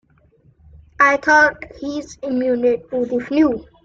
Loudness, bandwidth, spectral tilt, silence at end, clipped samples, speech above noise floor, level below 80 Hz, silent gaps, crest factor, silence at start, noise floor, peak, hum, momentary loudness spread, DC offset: -17 LUFS; 7.6 kHz; -4.5 dB/octave; 0.2 s; under 0.1%; 37 dB; -50 dBFS; none; 18 dB; 1 s; -54 dBFS; -2 dBFS; none; 15 LU; under 0.1%